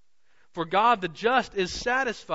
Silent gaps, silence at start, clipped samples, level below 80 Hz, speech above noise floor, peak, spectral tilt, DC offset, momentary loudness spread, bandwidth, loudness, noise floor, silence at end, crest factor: none; 0.55 s; under 0.1%; -54 dBFS; 43 dB; -10 dBFS; -3.5 dB/octave; 0.2%; 9 LU; 8 kHz; -25 LUFS; -69 dBFS; 0 s; 16 dB